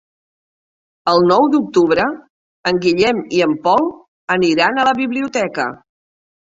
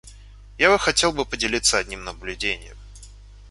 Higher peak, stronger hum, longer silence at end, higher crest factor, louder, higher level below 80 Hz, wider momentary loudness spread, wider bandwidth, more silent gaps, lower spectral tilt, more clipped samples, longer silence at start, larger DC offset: about the same, -2 dBFS vs -2 dBFS; neither; first, 0.85 s vs 0 s; second, 16 dB vs 22 dB; first, -16 LUFS vs -21 LUFS; second, -56 dBFS vs -42 dBFS; second, 10 LU vs 14 LU; second, 7.8 kHz vs 11.5 kHz; first, 2.30-2.63 s, 4.08-4.28 s vs none; first, -5 dB/octave vs -1.5 dB/octave; neither; first, 1.05 s vs 0.05 s; neither